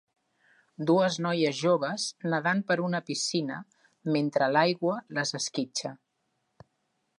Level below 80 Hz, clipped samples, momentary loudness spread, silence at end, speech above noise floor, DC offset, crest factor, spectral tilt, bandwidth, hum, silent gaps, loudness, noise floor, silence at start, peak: -80 dBFS; under 0.1%; 9 LU; 1.25 s; 50 dB; under 0.1%; 18 dB; -4.5 dB/octave; 11.5 kHz; none; none; -28 LUFS; -77 dBFS; 0.8 s; -10 dBFS